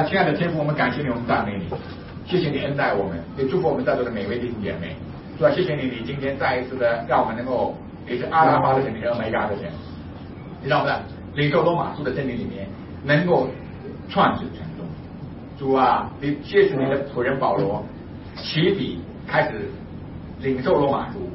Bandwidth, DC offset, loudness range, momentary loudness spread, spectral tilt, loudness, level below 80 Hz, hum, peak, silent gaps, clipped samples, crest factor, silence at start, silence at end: 5.8 kHz; under 0.1%; 3 LU; 17 LU; -10.5 dB/octave; -22 LUFS; -48 dBFS; none; -4 dBFS; none; under 0.1%; 18 dB; 0 s; 0 s